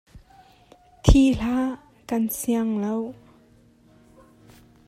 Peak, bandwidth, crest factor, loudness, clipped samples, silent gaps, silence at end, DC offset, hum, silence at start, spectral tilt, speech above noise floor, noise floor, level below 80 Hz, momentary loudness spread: 0 dBFS; 16 kHz; 24 dB; -23 LUFS; under 0.1%; none; 1.75 s; under 0.1%; none; 0.15 s; -6 dB/octave; 33 dB; -56 dBFS; -32 dBFS; 12 LU